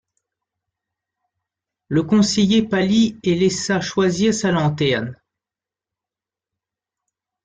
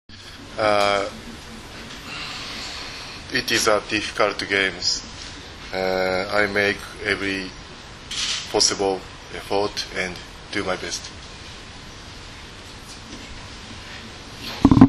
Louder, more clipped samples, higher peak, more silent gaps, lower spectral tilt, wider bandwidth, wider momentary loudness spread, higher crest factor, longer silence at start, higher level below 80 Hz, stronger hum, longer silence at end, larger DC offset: first, -18 LUFS vs -23 LUFS; neither; second, -4 dBFS vs 0 dBFS; neither; first, -5 dB/octave vs -3.5 dB/octave; second, 9.4 kHz vs 13 kHz; second, 6 LU vs 19 LU; second, 16 dB vs 24 dB; first, 1.9 s vs 0.1 s; second, -56 dBFS vs -42 dBFS; neither; first, 2.3 s vs 0 s; neither